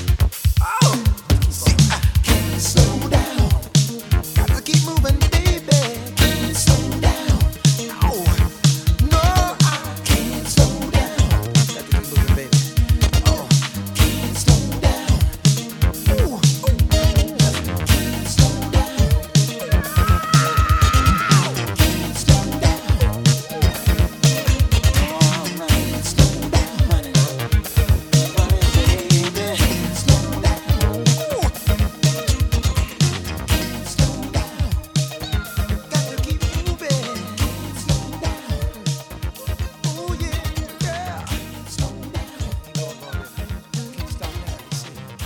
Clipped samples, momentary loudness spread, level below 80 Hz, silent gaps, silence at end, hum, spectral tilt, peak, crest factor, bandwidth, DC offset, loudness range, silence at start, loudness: under 0.1%; 10 LU; -22 dBFS; none; 0 s; none; -5 dB/octave; 0 dBFS; 18 dB; 19 kHz; under 0.1%; 9 LU; 0 s; -19 LUFS